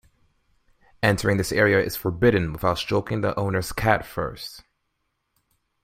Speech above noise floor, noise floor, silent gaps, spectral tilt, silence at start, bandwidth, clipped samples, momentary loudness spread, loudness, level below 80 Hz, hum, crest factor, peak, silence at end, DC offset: 53 dB; -75 dBFS; none; -5.5 dB/octave; 1 s; 16 kHz; under 0.1%; 11 LU; -23 LUFS; -46 dBFS; none; 20 dB; -4 dBFS; 1.25 s; under 0.1%